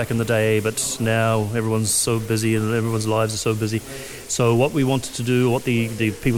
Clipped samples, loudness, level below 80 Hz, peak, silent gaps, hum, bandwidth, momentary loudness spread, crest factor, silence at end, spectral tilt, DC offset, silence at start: under 0.1%; -21 LUFS; -48 dBFS; -6 dBFS; none; none; 17 kHz; 5 LU; 14 dB; 0 s; -5 dB/octave; under 0.1%; 0 s